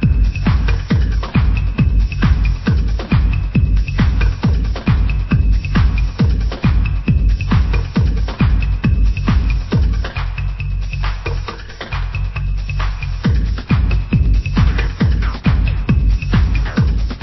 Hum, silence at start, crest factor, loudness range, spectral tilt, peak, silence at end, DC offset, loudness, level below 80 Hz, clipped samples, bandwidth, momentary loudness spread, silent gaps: none; 0 s; 12 dB; 4 LU; -8 dB/octave; -2 dBFS; 0 s; under 0.1%; -17 LUFS; -16 dBFS; under 0.1%; 6 kHz; 6 LU; none